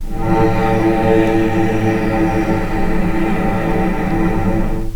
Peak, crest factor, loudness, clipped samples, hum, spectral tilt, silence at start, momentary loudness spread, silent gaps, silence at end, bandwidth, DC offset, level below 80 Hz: 0 dBFS; 14 dB; -16 LUFS; under 0.1%; none; -8 dB/octave; 0 s; 5 LU; none; 0 s; 18 kHz; under 0.1%; -22 dBFS